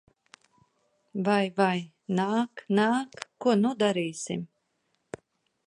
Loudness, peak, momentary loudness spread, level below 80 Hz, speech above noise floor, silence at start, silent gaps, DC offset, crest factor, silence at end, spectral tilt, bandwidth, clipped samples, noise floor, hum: -27 LUFS; -10 dBFS; 21 LU; -74 dBFS; 49 dB; 1.15 s; none; under 0.1%; 20 dB; 1.25 s; -5.5 dB/octave; 11 kHz; under 0.1%; -76 dBFS; none